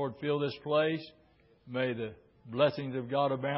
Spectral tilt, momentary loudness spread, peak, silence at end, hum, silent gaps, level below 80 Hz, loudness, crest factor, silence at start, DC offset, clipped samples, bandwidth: -4.5 dB/octave; 11 LU; -14 dBFS; 0 s; none; none; -70 dBFS; -32 LUFS; 18 dB; 0 s; under 0.1%; under 0.1%; 5.6 kHz